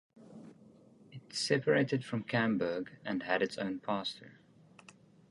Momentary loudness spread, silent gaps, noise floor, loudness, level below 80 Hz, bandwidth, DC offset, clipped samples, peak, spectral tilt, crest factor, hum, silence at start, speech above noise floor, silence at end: 24 LU; none; -60 dBFS; -34 LUFS; -74 dBFS; 11.5 kHz; under 0.1%; under 0.1%; -14 dBFS; -5 dB/octave; 22 dB; none; 0.15 s; 27 dB; 1 s